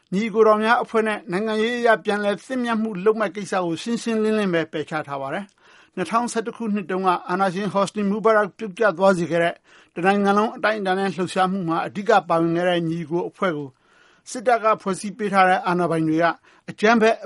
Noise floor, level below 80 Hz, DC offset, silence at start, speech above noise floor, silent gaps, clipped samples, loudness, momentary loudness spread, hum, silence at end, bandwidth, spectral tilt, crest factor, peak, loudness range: -56 dBFS; -68 dBFS; under 0.1%; 0.1 s; 35 dB; none; under 0.1%; -21 LUFS; 9 LU; none; 0 s; 11.5 kHz; -5.5 dB/octave; 18 dB; -2 dBFS; 4 LU